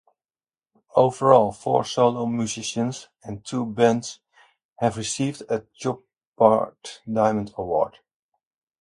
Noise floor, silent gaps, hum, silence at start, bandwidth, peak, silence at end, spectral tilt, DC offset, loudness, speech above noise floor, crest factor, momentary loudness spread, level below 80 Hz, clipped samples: under -90 dBFS; 4.65-4.76 s, 6.27-6.33 s; none; 0.95 s; 11.5 kHz; 0 dBFS; 0.9 s; -5.5 dB/octave; under 0.1%; -23 LUFS; over 68 dB; 22 dB; 13 LU; -60 dBFS; under 0.1%